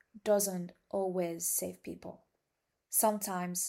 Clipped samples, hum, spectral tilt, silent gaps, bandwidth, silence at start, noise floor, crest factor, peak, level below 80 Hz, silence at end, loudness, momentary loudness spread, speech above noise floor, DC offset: under 0.1%; none; -4 dB/octave; none; 16 kHz; 0.15 s; -84 dBFS; 18 dB; -18 dBFS; -76 dBFS; 0 s; -33 LUFS; 16 LU; 50 dB; under 0.1%